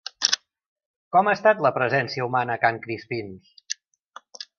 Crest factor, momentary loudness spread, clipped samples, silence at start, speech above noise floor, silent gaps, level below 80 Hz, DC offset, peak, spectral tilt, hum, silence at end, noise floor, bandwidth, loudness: 24 dB; 14 LU; under 0.1%; 0.2 s; 27 dB; 0.66-0.76 s, 0.86-1.11 s, 3.99-4.09 s; -68 dBFS; under 0.1%; 0 dBFS; -3 dB/octave; none; 0.15 s; -50 dBFS; 10 kHz; -23 LUFS